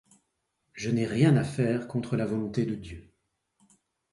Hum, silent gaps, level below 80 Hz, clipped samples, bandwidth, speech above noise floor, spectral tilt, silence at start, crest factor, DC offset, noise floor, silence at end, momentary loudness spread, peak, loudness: none; none; -58 dBFS; under 0.1%; 11.5 kHz; 51 dB; -7.5 dB/octave; 0.75 s; 20 dB; under 0.1%; -78 dBFS; 1.1 s; 18 LU; -10 dBFS; -28 LUFS